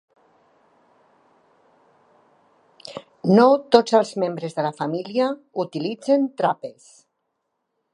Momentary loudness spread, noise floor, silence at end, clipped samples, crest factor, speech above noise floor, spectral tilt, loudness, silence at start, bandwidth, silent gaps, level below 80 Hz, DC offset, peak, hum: 22 LU; -76 dBFS; 1.25 s; under 0.1%; 22 dB; 56 dB; -6.5 dB/octave; -21 LUFS; 2.85 s; 11 kHz; none; -72 dBFS; under 0.1%; 0 dBFS; none